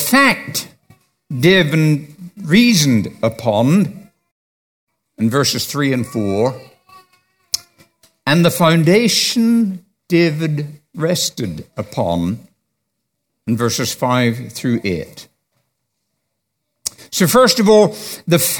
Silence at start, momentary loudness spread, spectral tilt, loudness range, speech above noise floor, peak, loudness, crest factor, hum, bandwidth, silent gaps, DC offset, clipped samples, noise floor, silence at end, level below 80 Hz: 0 s; 15 LU; -4.5 dB/octave; 6 LU; 59 dB; 0 dBFS; -15 LUFS; 16 dB; none; 19 kHz; 4.31-4.87 s; under 0.1%; under 0.1%; -74 dBFS; 0 s; -54 dBFS